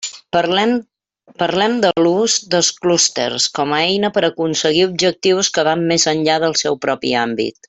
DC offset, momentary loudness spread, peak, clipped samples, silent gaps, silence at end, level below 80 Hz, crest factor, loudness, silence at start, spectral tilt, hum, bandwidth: under 0.1%; 5 LU; -2 dBFS; under 0.1%; none; 0.2 s; -58 dBFS; 16 dB; -16 LUFS; 0 s; -3 dB/octave; none; 8.4 kHz